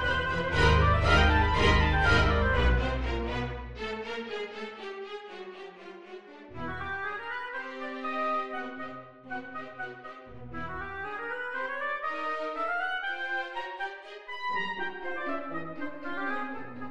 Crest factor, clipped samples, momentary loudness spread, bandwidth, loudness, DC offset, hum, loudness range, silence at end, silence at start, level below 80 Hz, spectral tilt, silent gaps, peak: 20 dB; under 0.1%; 19 LU; 9.6 kHz; -30 LUFS; 0.4%; none; 13 LU; 0 s; 0 s; -36 dBFS; -6 dB/octave; none; -10 dBFS